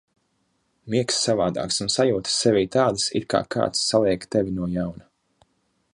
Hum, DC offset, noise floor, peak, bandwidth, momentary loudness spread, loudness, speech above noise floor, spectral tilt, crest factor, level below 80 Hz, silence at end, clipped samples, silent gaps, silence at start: none; under 0.1%; -70 dBFS; -4 dBFS; 11.5 kHz; 6 LU; -22 LUFS; 48 dB; -4 dB/octave; 20 dB; -52 dBFS; 0.95 s; under 0.1%; none; 0.85 s